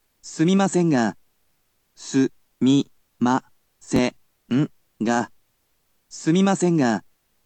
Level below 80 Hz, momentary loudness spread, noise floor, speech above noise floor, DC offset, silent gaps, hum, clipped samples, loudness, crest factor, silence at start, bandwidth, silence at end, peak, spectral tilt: -58 dBFS; 10 LU; -69 dBFS; 49 dB; under 0.1%; none; none; under 0.1%; -22 LUFS; 16 dB; 0.25 s; 9 kHz; 0.45 s; -6 dBFS; -6 dB/octave